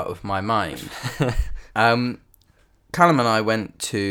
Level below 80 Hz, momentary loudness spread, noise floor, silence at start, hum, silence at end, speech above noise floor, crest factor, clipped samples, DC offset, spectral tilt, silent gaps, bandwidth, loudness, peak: -36 dBFS; 14 LU; -58 dBFS; 0 s; none; 0 s; 37 dB; 22 dB; under 0.1%; under 0.1%; -5 dB/octave; none; 19.5 kHz; -22 LUFS; 0 dBFS